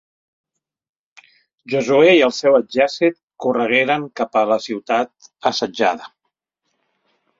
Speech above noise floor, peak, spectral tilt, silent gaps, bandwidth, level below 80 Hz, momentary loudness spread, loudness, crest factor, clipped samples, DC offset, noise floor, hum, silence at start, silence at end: 59 dB; 0 dBFS; -4.5 dB/octave; 3.23-3.28 s; 7.6 kHz; -64 dBFS; 10 LU; -17 LUFS; 18 dB; under 0.1%; under 0.1%; -76 dBFS; none; 1.7 s; 1.3 s